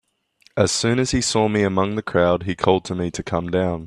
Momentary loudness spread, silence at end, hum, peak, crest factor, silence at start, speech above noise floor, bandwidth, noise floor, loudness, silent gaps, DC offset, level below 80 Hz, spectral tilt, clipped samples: 6 LU; 0 s; none; 0 dBFS; 20 dB; 0.55 s; 39 dB; 13.5 kHz; -59 dBFS; -20 LUFS; none; under 0.1%; -44 dBFS; -4.5 dB/octave; under 0.1%